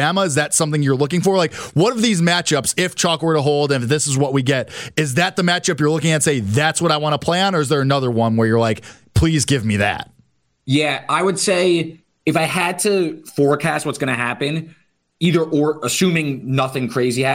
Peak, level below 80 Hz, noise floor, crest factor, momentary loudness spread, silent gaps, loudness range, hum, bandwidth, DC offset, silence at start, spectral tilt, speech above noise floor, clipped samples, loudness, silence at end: -4 dBFS; -42 dBFS; -58 dBFS; 14 dB; 5 LU; none; 3 LU; none; 16.5 kHz; under 0.1%; 0 s; -4.5 dB/octave; 41 dB; under 0.1%; -18 LUFS; 0 s